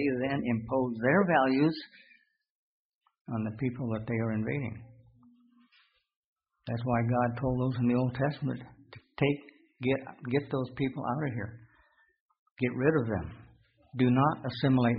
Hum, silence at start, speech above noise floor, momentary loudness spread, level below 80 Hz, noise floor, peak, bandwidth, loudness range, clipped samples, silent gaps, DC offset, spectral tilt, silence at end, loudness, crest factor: none; 0 s; 39 dB; 14 LU; -58 dBFS; -68 dBFS; -10 dBFS; 5 kHz; 6 LU; under 0.1%; 2.50-3.01 s, 3.21-3.25 s, 6.16-6.36 s, 12.20-12.29 s, 12.39-12.56 s; under 0.1%; -6.5 dB/octave; 0 s; -30 LUFS; 20 dB